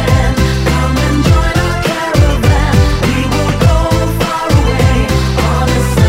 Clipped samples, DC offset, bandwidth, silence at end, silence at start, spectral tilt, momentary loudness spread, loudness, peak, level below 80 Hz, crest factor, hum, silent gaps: 0.4%; under 0.1%; 16.5 kHz; 0 s; 0 s; -6 dB/octave; 3 LU; -12 LUFS; 0 dBFS; -16 dBFS; 10 dB; none; none